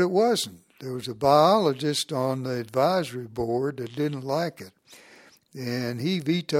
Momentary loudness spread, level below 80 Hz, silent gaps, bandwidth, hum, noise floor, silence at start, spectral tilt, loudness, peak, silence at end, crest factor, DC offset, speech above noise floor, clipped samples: 15 LU; -62 dBFS; none; 16.5 kHz; none; -54 dBFS; 0 s; -5.5 dB/octave; -25 LUFS; -6 dBFS; 0 s; 20 dB; under 0.1%; 29 dB; under 0.1%